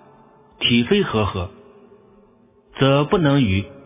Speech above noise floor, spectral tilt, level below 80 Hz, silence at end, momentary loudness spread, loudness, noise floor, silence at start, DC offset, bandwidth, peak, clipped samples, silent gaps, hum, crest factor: 36 dB; -10.5 dB/octave; -40 dBFS; 0.05 s; 12 LU; -18 LUFS; -54 dBFS; 0.6 s; under 0.1%; 3.8 kHz; -2 dBFS; under 0.1%; none; none; 18 dB